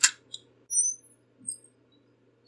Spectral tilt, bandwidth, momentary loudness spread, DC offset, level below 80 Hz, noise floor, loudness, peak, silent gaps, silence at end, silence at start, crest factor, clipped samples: 3.5 dB/octave; 11.5 kHz; 20 LU; under 0.1%; under -90 dBFS; -64 dBFS; -28 LUFS; -4 dBFS; none; 0.9 s; 0 s; 30 dB; under 0.1%